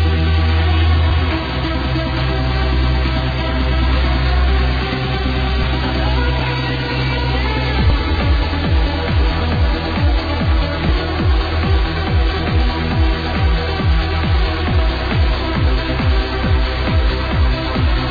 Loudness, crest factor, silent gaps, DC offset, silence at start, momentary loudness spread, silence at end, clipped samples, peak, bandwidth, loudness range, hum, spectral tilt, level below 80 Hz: -17 LUFS; 12 dB; none; under 0.1%; 0 s; 3 LU; 0 s; under 0.1%; -4 dBFS; 5 kHz; 1 LU; none; -7.5 dB/octave; -18 dBFS